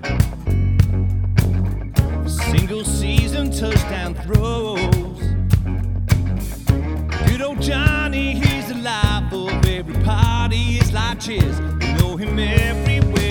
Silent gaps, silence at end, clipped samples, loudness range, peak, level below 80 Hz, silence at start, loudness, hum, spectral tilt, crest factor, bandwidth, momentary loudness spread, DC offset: none; 0 s; under 0.1%; 1 LU; 0 dBFS; -24 dBFS; 0 s; -19 LUFS; none; -6 dB/octave; 18 dB; 19 kHz; 5 LU; under 0.1%